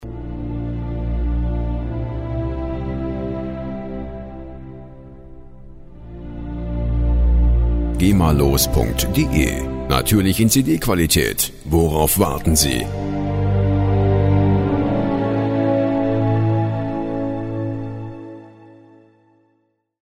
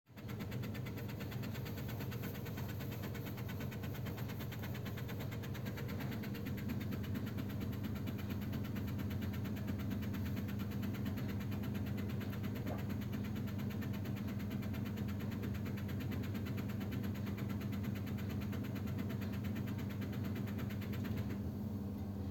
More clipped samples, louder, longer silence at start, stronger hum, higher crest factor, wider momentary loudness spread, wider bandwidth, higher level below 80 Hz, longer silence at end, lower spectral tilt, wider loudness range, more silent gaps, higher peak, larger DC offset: neither; first, -19 LUFS vs -42 LUFS; about the same, 0 s vs 0.05 s; second, none vs 50 Hz at -45 dBFS; about the same, 18 dB vs 14 dB; first, 16 LU vs 3 LU; about the same, 16 kHz vs 17 kHz; first, -26 dBFS vs -60 dBFS; first, 1.35 s vs 0 s; second, -5.5 dB/octave vs -7 dB/octave; first, 12 LU vs 2 LU; neither; first, -2 dBFS vs -28 dBFS; neither